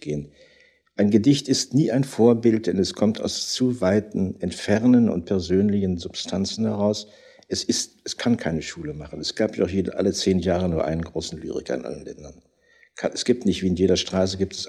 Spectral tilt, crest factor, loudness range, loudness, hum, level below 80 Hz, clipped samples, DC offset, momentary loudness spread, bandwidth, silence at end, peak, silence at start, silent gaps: -5.5 dB/octave; 18 dB; 5 LU; -23 LUFS; none; -50 dBFS; under 0.1%; under 0.1%; 12 LU; 13 kHz; 0 s; -4 dBFS; 0.05 s; none